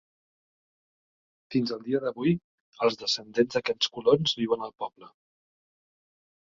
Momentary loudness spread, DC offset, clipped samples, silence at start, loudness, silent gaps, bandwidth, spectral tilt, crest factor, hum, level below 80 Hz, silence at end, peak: 8 LU; under 0.1%; under 0.1%; 1.5 s; -27 LUFS; 2.44-2.72 s; 7.6 kHz; -5 dB/octave; 22 dB; none; -68 dBFS; 1.5 s; -8 dBFS